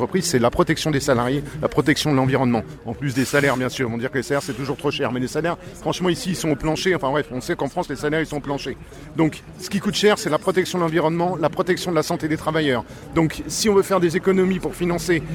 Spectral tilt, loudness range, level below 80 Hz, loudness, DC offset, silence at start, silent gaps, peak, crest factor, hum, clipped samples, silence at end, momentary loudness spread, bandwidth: -5 dB/octave; 3 LU; -44 dBFS; -21 LUFS; under 0.1%; 0 s; none; -4 dBFS; 18 dB; none; under 0.1%; 0 s; 7 LU; 19 kHz